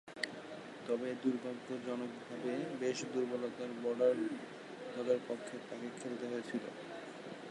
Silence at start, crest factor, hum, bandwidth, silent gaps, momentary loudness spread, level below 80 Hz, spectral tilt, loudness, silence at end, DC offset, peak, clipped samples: 0.05 s; 22 dB; none; 11.5 kHz; none; 13 LU; -86 dBFS; -5 dB/octave; -40 LUFS; 0 s; under 0.1%; -16 dBFS; under 0.1%